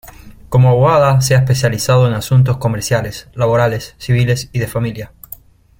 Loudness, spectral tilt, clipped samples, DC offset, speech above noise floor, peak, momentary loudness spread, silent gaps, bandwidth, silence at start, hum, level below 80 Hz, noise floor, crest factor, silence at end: -14 LUFS; -6 dB/octave; under 0.1%; under 0.1%; 25 dB; -2 dBFS; 15 LU; none; 16.5 kHz; 0.05 s; none; -40 dBFS; -38 dBFS; 12 dB; 0.75 s